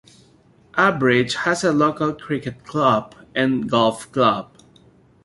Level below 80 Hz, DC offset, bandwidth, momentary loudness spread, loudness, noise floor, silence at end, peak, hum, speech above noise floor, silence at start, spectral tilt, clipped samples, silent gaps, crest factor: -56 dBFS; under 0.1%; 11.5 kHz; 9 LU; -20 LUFS; -54 dBFS; 0.8 s; -2 dBFS; none; 34 dB; 0.75 s; -5 dB/octave; under 0.1%; none; 18 dB